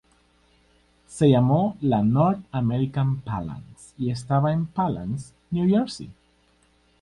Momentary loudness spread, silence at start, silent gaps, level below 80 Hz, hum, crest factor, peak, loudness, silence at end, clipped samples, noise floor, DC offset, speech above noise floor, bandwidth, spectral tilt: 14 LU; 1.1 s; none; -52 dBFS; 60 Hz at -50 dBFS; 18 dB; -6 dBFS; -23 LUFS; 0.9 s; under 0.1%; -62 dBFS; under 0.1%; 40 dB; 11.5 kHz; -8 dB/octave